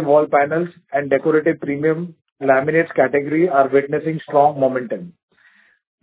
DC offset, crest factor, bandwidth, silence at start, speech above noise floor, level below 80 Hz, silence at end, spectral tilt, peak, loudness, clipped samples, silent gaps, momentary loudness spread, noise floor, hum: under 0.1%; 18 dB; 4 kHz; 0 s; 37 dB; -64 dBFS; 0.95 s; -11 dB/octave; 0 dBFS; -18 LUFS; under 0.1%; 2.32-2.36 s; 9 LU; -55 dBFS; none